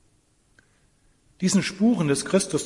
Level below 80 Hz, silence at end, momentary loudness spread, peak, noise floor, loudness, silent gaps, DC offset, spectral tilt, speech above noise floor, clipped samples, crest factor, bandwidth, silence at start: -60 dBFS; 0 s; 2 LU; -8 dBFS; -64 dBFS; -23 LUFS; none; under 0.1%; -5 dB/octave; 42 dB; under 0.1%; 18 dB; 11.5 kHz; 1.4 s